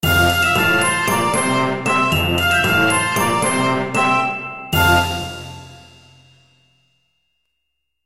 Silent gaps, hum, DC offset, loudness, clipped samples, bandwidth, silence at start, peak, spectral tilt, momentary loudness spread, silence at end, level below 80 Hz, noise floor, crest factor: none; none; under 0.1%; -16 LUFS; under 0.1%; 16 kHz; 0 s; -2 dBFS; -3.5 dB/octave; 10 LU; 2.15 s; -40 dBFS; -75 dBFS; 16 dB